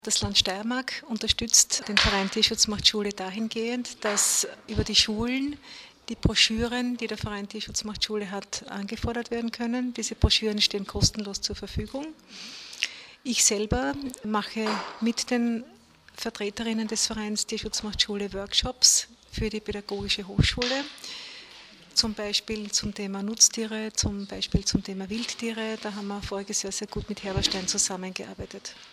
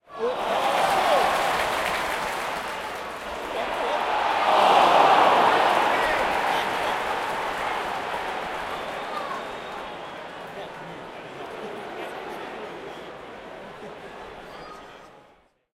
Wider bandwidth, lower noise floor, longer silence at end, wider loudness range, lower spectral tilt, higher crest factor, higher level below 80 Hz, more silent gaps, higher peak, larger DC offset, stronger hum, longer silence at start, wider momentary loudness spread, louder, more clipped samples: about the same, 15 kHz vs 16.5 kHz; second, -49 dBFS vs -58 dBFS; second, 0 s vs 0.6 s; second, 7 LU vs 17 LU; about the same, -2.5 dB/octave vs -3 dB/octave; about the same, 24 dB vs 22 dB; first, -42 dBFS vs -56 dBFS; neither; about the same, -4 dBFS vs -4 dBFS; neither; neither; about the same, 0.05 s vs 0.1 s; second, 14 LU vs 22 LU; second, -26 LUFS vs -23 LUFS; neither